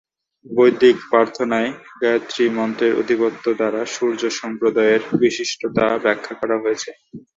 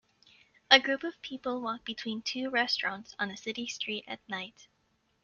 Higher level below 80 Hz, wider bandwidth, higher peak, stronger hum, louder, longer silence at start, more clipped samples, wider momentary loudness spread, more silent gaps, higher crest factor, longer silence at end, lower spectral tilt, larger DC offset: first, -60 dBFS vs -76 dBFS; about the same, 7.8 kHz vs 7.4 kHz; about the same, -2 dBFS vs -4 dBFS; neither; first, -19 LUFS vs -30 LUFS; second, 0.45 s vs 0.7 s; neither; second, 8 LU vs 16 LU; neither; second, 16 dB vs 30 dB; second, 0.2 s vs 0.6 s; first, -4.5 dB/octave vs -2 dB/octave; neither